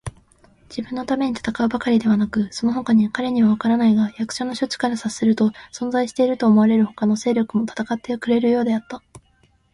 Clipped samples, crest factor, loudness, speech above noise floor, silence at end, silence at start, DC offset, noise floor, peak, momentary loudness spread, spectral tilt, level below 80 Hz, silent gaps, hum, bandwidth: under 0.1%; 14 dB; -20 LUFS; 40 dB; 0.55 s; 0.05 s; under 0.1%; -59 dBFS; -6 dBFS; 9 LU; -6 dB/octave; -54 dBFS; none; none; 11.5 kHz